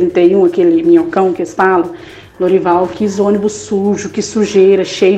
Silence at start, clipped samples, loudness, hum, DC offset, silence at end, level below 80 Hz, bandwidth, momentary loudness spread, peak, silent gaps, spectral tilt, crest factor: 0 s; under 0.1%; -12 LUFS; none; under 0.1%; 0 s; -50 dBFS; 8.8 kHz; 8 LU; 0 dBFS; none; -6 dB/octave; 12 dB